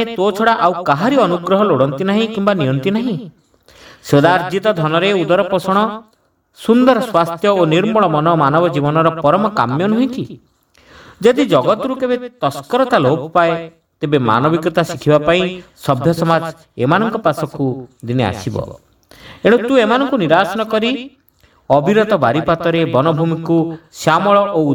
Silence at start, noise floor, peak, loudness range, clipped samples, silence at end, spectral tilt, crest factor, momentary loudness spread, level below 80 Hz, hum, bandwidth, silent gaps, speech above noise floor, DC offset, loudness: 0 s; -53 dBFS; 0 dBFS; 3 LU; under 0.1%; 0 s; -6.5 dB/octave; 14 dB; 9 LU; -50 dBFS; none; 19.5 kHz; none; 39 dB; under 0.1%; -15 LUFS